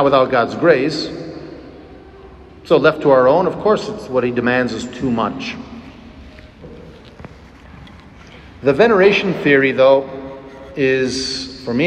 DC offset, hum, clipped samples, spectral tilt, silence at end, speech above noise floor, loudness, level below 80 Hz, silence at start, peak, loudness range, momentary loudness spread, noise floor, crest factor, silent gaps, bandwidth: under 0.1%; none; under 0.1%; -5.5 dB/octave; 0 s; 25 dB; -15 LUFS; -46 dBFS; 0 s; 0 dBFS; 12 LU; 20 LU; -40 dBFS; 16 dB; none; 9.6 kHz